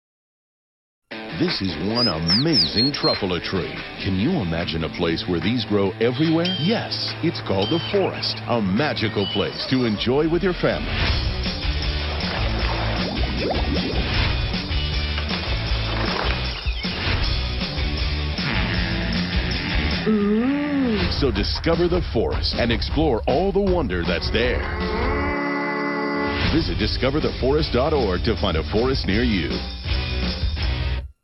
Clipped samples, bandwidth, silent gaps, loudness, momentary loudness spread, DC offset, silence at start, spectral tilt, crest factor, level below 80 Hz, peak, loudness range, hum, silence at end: under 0.1%; 9.6 kHz; none; -22 LUFS; 5 LU; under 0.1%; 1.1 s; -7 dB/octave; 16 dB; -30 dBFS; -6 dBFS; 3 LU; none; 0.15 s